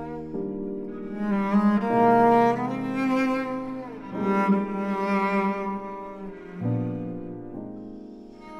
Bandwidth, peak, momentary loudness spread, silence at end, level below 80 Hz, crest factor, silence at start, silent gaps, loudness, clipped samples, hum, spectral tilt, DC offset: 10 kHz; -8 dBFS; 18 LU; 0 s; -54 dBFS; 18 dB; 0 s; none; -25 LUFS; under 0.1%; none; -8.5 dB/octave; under 0.1%